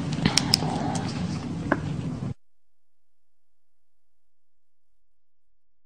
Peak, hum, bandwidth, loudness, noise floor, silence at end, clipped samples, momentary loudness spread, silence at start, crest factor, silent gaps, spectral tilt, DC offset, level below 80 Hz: 0 dBFS; none; 14 kHz; -26 LUFS; -87 dBFS; 3.5 s; under 0.1%; 12 LU; 0 s; 30 dB; none; -4 dB/octave; 0.4%; -50 dBFS